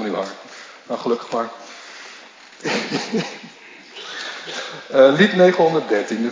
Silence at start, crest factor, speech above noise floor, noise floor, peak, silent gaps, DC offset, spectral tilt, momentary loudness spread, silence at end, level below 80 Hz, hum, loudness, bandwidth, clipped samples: 0 s; 20 dB; 25 dB; -43 dBFS; 0 dBFS; none; under 0.1%; -5 dB/octave; 24 LU; 0 s; -78 dBFS; none; -19 LUFS; 7.6 kHz; under 0.1%